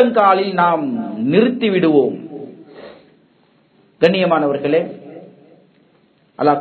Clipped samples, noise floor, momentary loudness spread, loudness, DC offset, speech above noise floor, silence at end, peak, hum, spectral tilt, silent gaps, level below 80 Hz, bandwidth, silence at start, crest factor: under 0.1%; -55 dBFS; 20 LU; -16 LUFS; under 0.1%; 41 dB; 0 s; 0 dBFS; none; -8.5 dB/octave; none; -66 dBFS; 6.6 kHz; 0 s; 18 dB